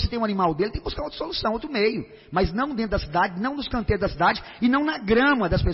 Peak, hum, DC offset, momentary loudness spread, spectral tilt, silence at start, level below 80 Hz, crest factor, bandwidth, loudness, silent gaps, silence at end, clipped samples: -10 dBFS; none; under 0.1%; 8 LU; -9.5 dB/octave; 0 s; -36 dBFS; 14 dB; 5.8 kHz; -24 LUFS; none; 0 s; under 0.1%